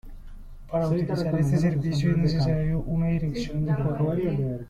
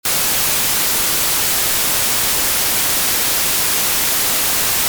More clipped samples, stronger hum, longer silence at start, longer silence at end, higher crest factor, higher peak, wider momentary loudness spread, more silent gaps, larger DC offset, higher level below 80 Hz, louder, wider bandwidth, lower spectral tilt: neither; neither; about the same, 0.05 s vs 0.05 s; about the same, 0 s vs 0 s; about the same, 12 dB vs 12 dB; second, -12 dBFS vs -4 dBFS; first, 5 LU vs 0 LU; neither; neither; about the same, -40 dBFS vs -42 dBFS; second, -25 LUFS vs -13 LUFS; second, 10 kHz vs over 20 kHz; first, -8 dB/octave vs 0 dB/octave